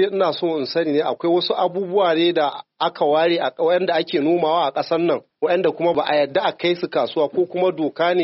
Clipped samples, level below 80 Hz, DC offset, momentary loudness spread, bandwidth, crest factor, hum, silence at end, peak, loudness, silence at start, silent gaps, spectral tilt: under 0.1%; -68 dBFS; under 0.1%; 4 LU; 6 kHz; 14 dB; none; 0 s; -4 dBFS; -20 LUFS; 0 s; none; -3 dB/octave